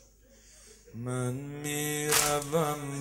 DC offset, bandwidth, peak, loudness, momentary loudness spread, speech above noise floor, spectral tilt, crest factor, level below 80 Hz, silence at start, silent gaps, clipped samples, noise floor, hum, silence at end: under 0.1%; 16 kHz; -4 dBFS; -29 LUFS; 12 LU; 27 dB; -3.5 dB/octave; 28 dB; -58 dBFS; 0.45 s; none; under 0.1%; -58 dBFS; none; 0 s